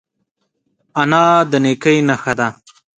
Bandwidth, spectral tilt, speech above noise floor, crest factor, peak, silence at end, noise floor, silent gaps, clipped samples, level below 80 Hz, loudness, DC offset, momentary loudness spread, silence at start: 9.4 kHz; -5.5 dB/octave; 57 dB; 16 dB; 0 dBFS; 0.45 s; -70 dBFS; none; under 0.1%; -56 dBFS; -14 LUFS; under 0.1%; 9 LU; 0.95 s